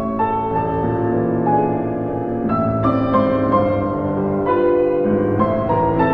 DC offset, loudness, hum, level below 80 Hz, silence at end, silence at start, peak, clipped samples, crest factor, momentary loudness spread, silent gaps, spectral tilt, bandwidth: under 0.1%; -18 LUFS; none; -40 dBFS; 0 s; 0 s; -2 dBFS; under 0.1%; 16 dB; 4 LU; none; -11 dB/octave; 5.2 kHz